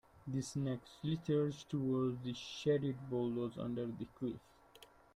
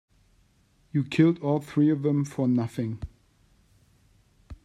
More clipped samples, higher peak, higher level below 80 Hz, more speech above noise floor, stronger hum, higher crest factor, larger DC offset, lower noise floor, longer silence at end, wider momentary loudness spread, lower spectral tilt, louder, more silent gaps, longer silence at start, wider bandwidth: neither; second, -22 dBFS vs -10 dBFS; second, -70 dBFS vs -54 dBFS; second, 24 dB vs 39 dB; neither; about the same, 16 dB vs 18 dB; neither; about the same, -63 dBFS vs -64 dBFS; first, 0.3 s vs 0.1 s; second, 8 LU vs 11 LU; about the same, -7 dB/octave vs -8 dB/octave; second, -40 LUFS vs -26 LUFS; neither; second, 0.15 s vs 0.95 s; about the same, 13 kHz vs 12.5 kHz